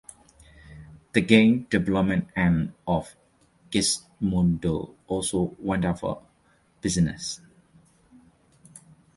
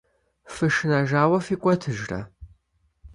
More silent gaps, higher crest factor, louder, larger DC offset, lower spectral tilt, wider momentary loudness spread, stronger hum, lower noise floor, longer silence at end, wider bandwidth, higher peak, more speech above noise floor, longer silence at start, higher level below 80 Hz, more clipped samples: neither; about the same, 24 dB vs 20 dB; about the same, -25 LUFS vs -23 LUFS; neither; second, -5 dB/octave vs -6.5 dB/octave; about the same, 13 LU vs 14 LU; neither; second, -63 dBFS vs -67 dBFS; first, 0.4 s vs 0.05 s; about the same, 11.5 kHz vs 11.5 kHz; first, -2 dBFS vs -6 dBFS; second, 39 dB vs 45 dB; first, 0.7 s vs 0.45 s; first, -46 dBFS vs -52 dBFS; neither